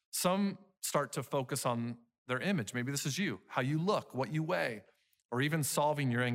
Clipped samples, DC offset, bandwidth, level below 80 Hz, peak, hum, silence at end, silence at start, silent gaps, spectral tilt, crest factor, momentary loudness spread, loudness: under 0.1%; under 0.1%; 16 kHz; -78 dBFS; -18 dBFS; none; 0 s; 0.15 s; 2.18-2.26 s, 5.25-5.29 s; -4.5 dB/octave; 16 dB; 7 LU; -35 LUFS